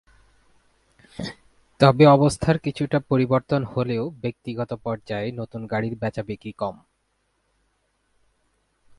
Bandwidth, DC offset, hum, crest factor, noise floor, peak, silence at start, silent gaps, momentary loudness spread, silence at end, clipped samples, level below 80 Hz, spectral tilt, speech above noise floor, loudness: 11.5 kHz; under 0.1%; none; 24 dB; -71 dBFS; 0 dBFS; 1.2 s; none; 19 LU; 2.25 s; under 0.1%; -52 dBFS; -7 dB/octave; 49 dB; -22 LUFS